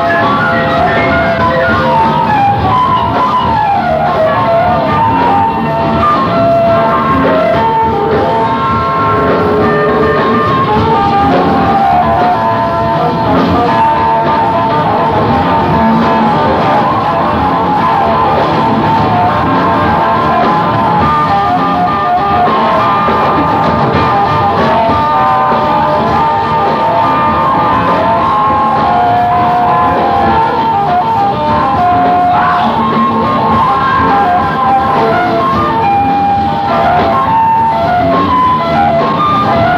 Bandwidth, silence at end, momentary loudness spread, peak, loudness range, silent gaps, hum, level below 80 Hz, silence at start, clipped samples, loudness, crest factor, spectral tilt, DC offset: 15 kHz; 0 s; 2 LU; 0 dBFS; 1 LU; none; none; -34 dBFS; 0 s; under 0.1%; -10 LUFS; 10 dB; -7.5 dB/octave; under 0.1%